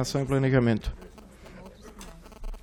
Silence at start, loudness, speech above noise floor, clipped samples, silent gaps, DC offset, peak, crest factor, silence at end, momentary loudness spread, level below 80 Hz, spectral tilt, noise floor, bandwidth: 0 s; -25 LUFS; 22 dB; under 0.1%; none; under 0.1%; -8 dBFS; 20 dB; 0.05 s; 25 LU; -42 dBFS; -6.5 dB/octave; -48 dBFS; 15 kHz